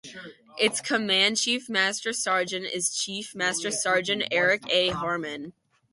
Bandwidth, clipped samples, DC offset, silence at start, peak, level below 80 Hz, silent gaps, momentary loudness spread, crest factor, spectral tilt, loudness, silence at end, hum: 11.5 kHz; under 0.1%; under 0.1%; 0.05 s; -8 dBFS; -64 dBFS; none; 12 LU; 18 dB; -1.5 dB/octave; -25 LUFS; 0.4 s; none